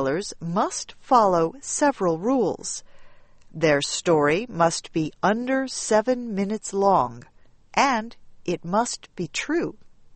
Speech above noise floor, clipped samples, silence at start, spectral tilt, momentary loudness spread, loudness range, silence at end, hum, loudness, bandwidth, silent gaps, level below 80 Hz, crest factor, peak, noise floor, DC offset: 23 dB; under 0.1%; 0 s; -4 dB/octave; 10 LU; 2 LU; 0 s; none; -23 LUFS; 8.8 kHz; none; -54 dBFS; 20 dB; -4 dBFS; -46 dBFS; under 0.1%